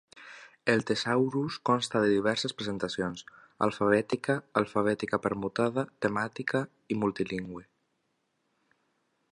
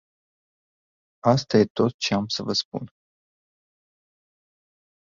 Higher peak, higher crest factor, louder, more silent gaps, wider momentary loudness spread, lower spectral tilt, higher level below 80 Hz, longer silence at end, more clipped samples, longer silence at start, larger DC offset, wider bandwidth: second, -10 dBFS vs -4 dBFS; about the same, 22 dB vs 24 dB; second, -30 LUFS vs -23 LUFS; second, none vs 1.70-1.75 s, 1.94-1.99 s, 2.65-2.72 s; second, 9 LU vs 14 LU; about the same, -5.5 dB/octave vs -5.5 dB/octave; about the same, -66 dBFS vs -62 dBFS; second, 1.7 s vs 2.2 s; neither; second, 0.15 s vs 1.25 s; neither; first, 11.5 kHz vs 7.6 kHz